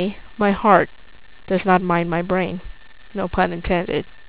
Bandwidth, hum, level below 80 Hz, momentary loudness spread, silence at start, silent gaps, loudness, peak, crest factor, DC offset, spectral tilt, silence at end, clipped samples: 4 kHz; none; -40 dBFS; 12 LU; 0 s; none; -20 LUFS; 0 dBFS; 20 dB; 1%; -10.5 dB/octave; 0.25 s; under 0.1%